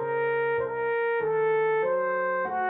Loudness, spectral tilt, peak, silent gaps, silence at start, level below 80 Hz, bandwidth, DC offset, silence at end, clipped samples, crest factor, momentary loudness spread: -26 LUFS; -3.5 dB/octave; -18 dBFS; none; 0 s; -68 dBFS; 4 kHz; under 0.1%; 0 s; under 0.1%; 8 dB; 3 LU